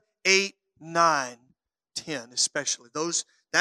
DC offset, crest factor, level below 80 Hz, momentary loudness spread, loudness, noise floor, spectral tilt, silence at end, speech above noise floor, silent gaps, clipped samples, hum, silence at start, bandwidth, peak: under 0.1%; 24 dB; -80 dBFS; 13 LU; -25 LUFS; -70 dBFS; -1 dB/octave; 0 s; 44 dB; none; under 0.1%; none; 0.25 s; 13.5 kHz; -4 dBFS